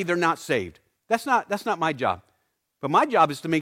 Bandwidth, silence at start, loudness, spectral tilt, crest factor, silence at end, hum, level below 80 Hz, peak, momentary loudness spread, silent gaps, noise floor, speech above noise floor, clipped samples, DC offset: 16.5 kHz; 0 s; -24 LUFS; -5 dB/octave; 18 dB; 0 s; none; -64 dBFS; -6 dBFS; 8 LU; none; -73 dBFS; 50 dB; under 0.1%; under 0.1%